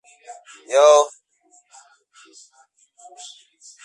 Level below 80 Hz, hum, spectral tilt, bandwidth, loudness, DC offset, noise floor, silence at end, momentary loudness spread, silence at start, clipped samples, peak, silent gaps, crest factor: -84 dBFS; none; 1.5 dB/octave; 11 kHz; -16 LUFS; under 0.1%; -58 dBFS; 2.75 s; 28 LU; 0.3 s; under 0.1%; -2 dBFS; none; 20 dB